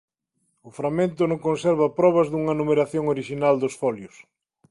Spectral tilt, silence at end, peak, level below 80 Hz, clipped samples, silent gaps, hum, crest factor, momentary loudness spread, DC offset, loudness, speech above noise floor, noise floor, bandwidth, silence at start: -7 dB/octave; 0.65 s; -6 dBFS; -60 dBFS; under 0.1%; none; none; 16 dB; 8 LU; under 0.1%; -22 LUFS; 51 dB; -73 dBFS; 11.5 kHz; 0.65 s